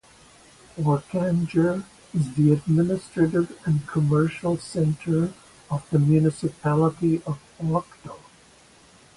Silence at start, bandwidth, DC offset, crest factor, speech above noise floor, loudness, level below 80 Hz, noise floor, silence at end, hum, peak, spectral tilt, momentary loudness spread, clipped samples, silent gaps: 0.75 s; 11.5 kHz; under 0.1%; 16 dB; 31 dB; -24 LUFS; -54 dBFS; -53 dBFS; 1 s; none; -8 dBFS; -8.5 dB/octave; 11 LU; under 0.1%; none